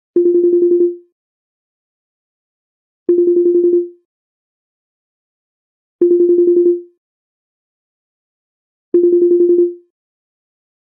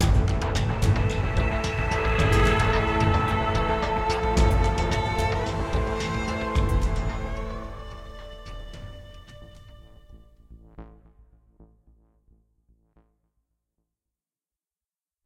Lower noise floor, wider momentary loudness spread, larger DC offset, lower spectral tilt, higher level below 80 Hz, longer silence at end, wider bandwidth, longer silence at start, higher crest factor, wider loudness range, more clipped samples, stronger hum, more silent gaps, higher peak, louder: about the same, under -90 dBFS vs under -90 dBFS; second, 7 LU vs 20 LU; neither; first, -13.5 dB/octave vs -6 dB/octave; second, -80 dBFS vs -30 dBFS; second, 1.2 s vs 3.6 s; second, 1.1 kHz vs 13.5 kHz; first, 0.15 s vs 0 s; about the same, 14 dB vs 18 dB; second, 1 LU vs 21 LU; neither; neither; first, 1.12-3.06 s, 4.05-5.99 s, 6.98-8.92 s vs none; first, -2 dBFS vs -8 dBFS; first, -13 LUFS vs -25 LUFS